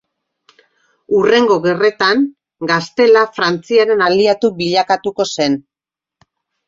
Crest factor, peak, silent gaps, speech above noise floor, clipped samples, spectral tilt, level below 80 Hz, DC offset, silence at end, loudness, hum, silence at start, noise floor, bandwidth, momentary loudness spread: 14 dB; 0 dBFS; none; 74 dB; under 0.1%; -4.5 dB/octave; -58 dBFS; under 0.1%; 1.05 s; -14 LUFS; none; 1.1 s; -87 dBFS; 7.8 kHz; 7 LU